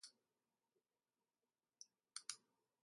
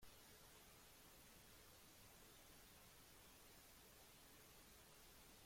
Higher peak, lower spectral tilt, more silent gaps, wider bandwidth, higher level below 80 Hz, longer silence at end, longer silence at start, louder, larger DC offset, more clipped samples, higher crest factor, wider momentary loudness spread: first, -28 dBFS vs -52 dBFS; second, 3 dB/octave vs -2.5 dB/octave; neither; second, 11.5 kHz vs 16.5 kHz; second, under -90 dBFS vs -76 dBFS; first, 0.45 s vs 0 s; about the same, 0.05 s vs 0 s; first, -56 LUFS vs -65 LUFS; neither; neither; first, 36 dB vs 14 dB; first, 13 LU vs 0 LU